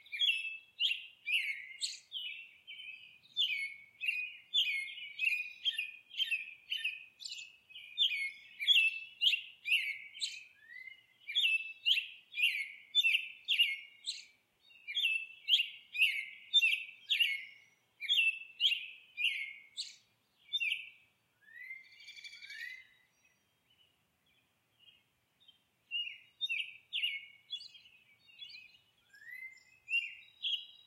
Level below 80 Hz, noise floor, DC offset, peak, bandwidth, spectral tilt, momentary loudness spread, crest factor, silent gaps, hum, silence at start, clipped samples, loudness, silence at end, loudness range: under -90 dBFS; -75 dBFS; under 0.1%; -16 dBFS; 16 kHz; 4.5 dB/octave; 20 LU; 22 dB; none; none; 0.1 s; under 0.1%; -33 LUFS; 0.1 s; 12 LU